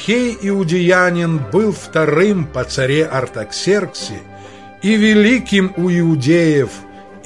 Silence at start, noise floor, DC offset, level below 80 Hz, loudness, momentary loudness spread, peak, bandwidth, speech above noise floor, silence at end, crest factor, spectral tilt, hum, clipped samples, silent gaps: 0 s; -36 dBFS; 0.3%; -46 dBFS; -15 LUFS; 11 LU; 0 dBFS; 11.5 kHz; 22 dB; 0.05 s; 14 dB; -6 dB/octave; none; under 0.1%; none